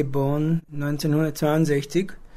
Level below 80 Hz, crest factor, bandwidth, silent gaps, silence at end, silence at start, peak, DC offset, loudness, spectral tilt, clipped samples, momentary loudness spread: -46 dBFS; 14 dB; 15.5 kHz; none; 0 s; 0 s; -8 dBFS; under 0.1%; -23 LUFS; -7 dB/octave; under 0.1%; 5 LU